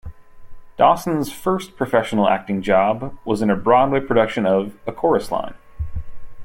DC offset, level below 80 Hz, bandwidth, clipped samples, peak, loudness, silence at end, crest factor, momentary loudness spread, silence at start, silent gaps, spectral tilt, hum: under 0.1%; -40 dBFS; 16.5 kHz; under 0.1%; -2 dBFS; -19 LUFS; 0 s; 18 dB; 15 LU; 0.05 s; none; -6.5 dB/octave; none